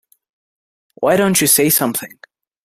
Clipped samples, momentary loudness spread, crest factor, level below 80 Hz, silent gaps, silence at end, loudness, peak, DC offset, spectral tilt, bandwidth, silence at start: under 0.1%; 12 LU; 18 dB; -56 dBFS; none; 0.6 s; -14 LUFS; 0 dBFS; under 0.1%; -3 dB/octave; 16 kHz; 1 s